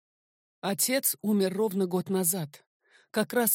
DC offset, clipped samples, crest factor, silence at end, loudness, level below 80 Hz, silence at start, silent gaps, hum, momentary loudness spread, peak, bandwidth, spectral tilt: under 0.1%; under 0.1%; 18 dB; 0 s; -28 LUFS; -80 dBFS; 0.65 s; 2.67-2.80 s; none; 9 LU; -10 dBFS; 17 kHz; -4 dB/octave